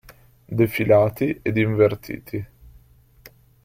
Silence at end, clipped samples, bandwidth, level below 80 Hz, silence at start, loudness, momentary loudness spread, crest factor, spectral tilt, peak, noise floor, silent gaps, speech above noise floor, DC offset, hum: 0.35 s; under 0.1%; 16 kHz; -52 dBFS; 0.5 s; -21 LUFS; 15 LU; 18 dB; -8 dB/octave; -4 dBFS; -52 dBFS; none; 32 dB; under 0.1%; none